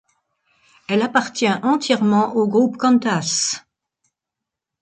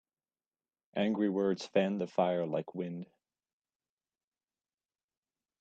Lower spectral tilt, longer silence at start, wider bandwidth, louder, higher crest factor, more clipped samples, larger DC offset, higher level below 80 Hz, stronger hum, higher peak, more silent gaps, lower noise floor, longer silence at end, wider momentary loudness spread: second, -4 dB/octave vs -7 dB/octave; about the same, 0.9 s vs 0.95 s; first, 9.4 kHz vs 8.2 kHz; first, -18 LUFS vs -33 LUFS; about the same, 18 dB vs 22 dB; neither; neither; first, -68 dBFS vs -80 dBFS; neither; first, -2 dBFS vs -14 dBFS; neither; second, -84 dBFS vs under -90 dBFS; second, 1.2 s vs 2.55 s; second, 6 LU vs 11 LU